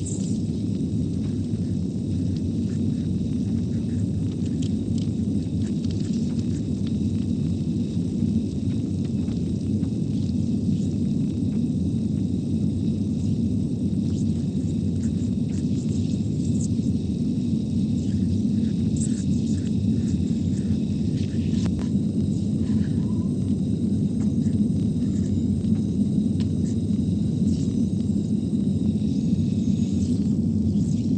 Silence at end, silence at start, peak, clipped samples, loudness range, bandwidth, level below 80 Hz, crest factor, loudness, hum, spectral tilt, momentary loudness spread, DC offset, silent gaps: 0 s; 0 s; -10 dBFS; under 0.1%; 2 LU; 9.2 kHz; -42 dBFS; 14 dB; -24 LUFS; none; -8 dB/octave; 3 LU; under 0.1%; none